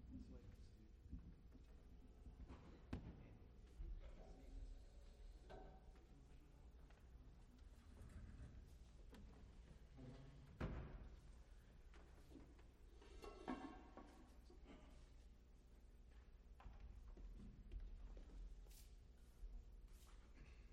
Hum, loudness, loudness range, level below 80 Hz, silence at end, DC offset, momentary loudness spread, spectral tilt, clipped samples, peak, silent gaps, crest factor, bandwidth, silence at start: none; -63 LUFS; 6 LU; -62 dBFS; 0 s; under 0.1%; 11 LU; -6.5 dB/octave; under 0.1%; -34 dBFS; none; 26 dB; 13 kHz; 0 s